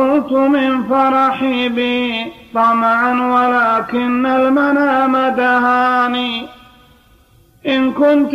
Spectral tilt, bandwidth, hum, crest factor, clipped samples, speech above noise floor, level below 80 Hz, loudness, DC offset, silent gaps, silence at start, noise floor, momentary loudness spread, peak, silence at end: -5.5 dB/octave; 7.6 kHz; none; 12 dB; under 0.1%; 35 dB; -54 dBFS; -14 LUFS; under 0.1%; none; 0 s; -49 dBFS; 6 LU; -2 dBFS; 0 s